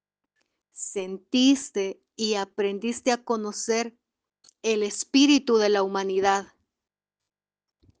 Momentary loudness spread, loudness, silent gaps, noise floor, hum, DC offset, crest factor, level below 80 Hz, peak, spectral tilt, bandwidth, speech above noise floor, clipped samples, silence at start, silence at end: 12 LU; -25 LUFS; none; -90 dBFS; none; under 0.1%; 18 dB; -72 dBFS; -8 dBFS; -3 dB/octave; 10 kHz; 66 dB; under 0.1%; 0.75 s; 1.55 s